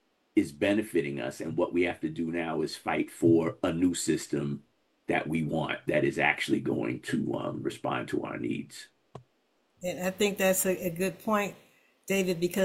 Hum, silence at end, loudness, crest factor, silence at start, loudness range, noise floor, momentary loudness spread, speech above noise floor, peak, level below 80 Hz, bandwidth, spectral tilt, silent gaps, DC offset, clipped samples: none; 0 s; -30 LUFS; 22 dB; 0.35 s; 4 LU; -72 dBFS; 9 LU; 43 dB; -8 dBFS; -64 dBFS; 16.5 kHz; -5 dB/octave; none; under 0.1%; under 0.1%